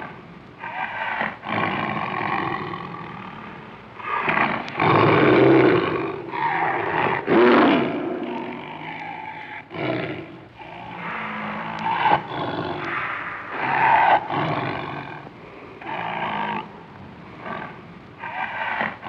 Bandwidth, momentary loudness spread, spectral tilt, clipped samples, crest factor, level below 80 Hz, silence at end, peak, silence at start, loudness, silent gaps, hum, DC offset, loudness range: 6.6 kHz; 22 LU; -8 dB/octave; under 0.1%; 20 dB; -58 dBFS; 0 s; -4 dBFS; 0 s; -22 LUFS; none; none; under 0.1%; 12 LU